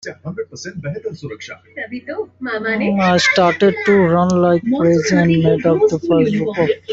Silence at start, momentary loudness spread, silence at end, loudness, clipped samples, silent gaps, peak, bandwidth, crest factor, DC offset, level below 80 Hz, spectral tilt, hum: 0.05 s; 15 LU; 0 s; -15 LUFS; under 0.1%; none; -2 dBFS; 8 kHz; 14 dB; under 0.1%; -52 dBFS; -6 dB/octave; none